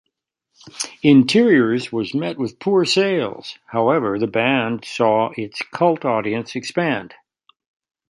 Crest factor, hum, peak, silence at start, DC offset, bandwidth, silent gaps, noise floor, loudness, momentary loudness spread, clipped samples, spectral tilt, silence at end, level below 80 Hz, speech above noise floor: 18 dB; none; 0 dBFS; 0.75 s; under 0.1%; 11.5 kHz; none; -77 dBFS; -19 LUFS; 12 LU; under 0.1%; -5.5 dB/octave; 1.05 s; -62 dBFS; 58 dB